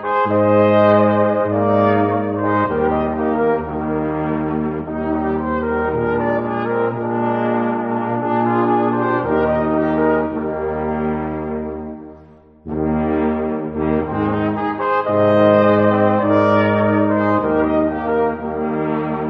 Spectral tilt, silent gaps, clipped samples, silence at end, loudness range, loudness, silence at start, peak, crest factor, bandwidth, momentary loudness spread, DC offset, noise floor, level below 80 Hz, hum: -10 dB/octave; none; under 0.1%; 0 s; 7 LU; -17 LUFS; 0 s; -2 dBFS; 16 dB; 5.6 kHz; 8 LU; under 0.1%; -44 dBFS; -42 dBFS; none